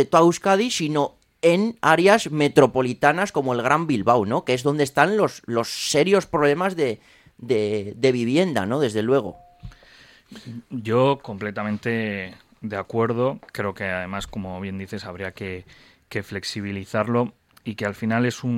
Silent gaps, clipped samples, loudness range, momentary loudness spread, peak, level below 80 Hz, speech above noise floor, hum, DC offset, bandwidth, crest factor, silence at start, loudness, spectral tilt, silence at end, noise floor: none; under 0.1%; 9 LU; 15 LU; 0 dBFS; -56 dBFS; 29 dB; none; under 0.1%; 16.5 kHz; 22 dB; 0 s; -22 LUFS; -5 dB/octave; 0 s; -51 dBFS